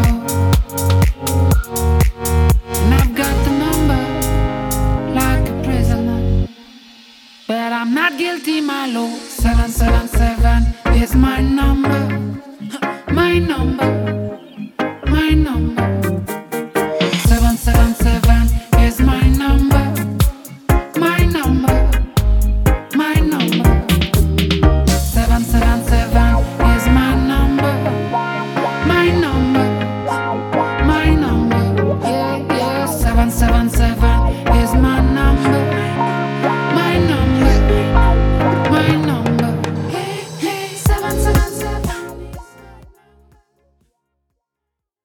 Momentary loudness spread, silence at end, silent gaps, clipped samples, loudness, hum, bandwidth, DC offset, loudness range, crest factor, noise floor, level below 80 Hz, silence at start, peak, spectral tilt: 8 LU; 2.3 s; none; under 0.1%; -16 LUFS; none; 20 kHz; under 0.1%; 5 LU; 14 dB; -80 dBFS; -18 dBFS; 0 s; 0 dBFS; -6 dB/octave